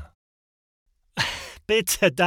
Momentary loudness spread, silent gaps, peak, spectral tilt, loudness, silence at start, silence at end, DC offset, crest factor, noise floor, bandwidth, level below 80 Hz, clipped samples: 14 LU; 0.15-0.86 s; -6 dBFS; -3 dB/octave; -23 LUFS; 0 s; 0 s; under 0.1%; 20 dB; under -90 dBFS; 18 kHz; -52 dBFS; under 0.1%